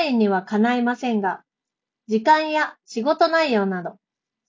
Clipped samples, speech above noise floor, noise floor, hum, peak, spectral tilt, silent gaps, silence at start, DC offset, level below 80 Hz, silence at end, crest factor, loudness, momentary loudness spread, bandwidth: under 0.1%; 66 dB; -86 dBFS; none; -4 dBFS; -6 dB/octave; none; 0 s; under 0.1%; -72 dBFS; 0.55 s; 16 dB; -21 LUFS; 9 LU; 7.6 kHz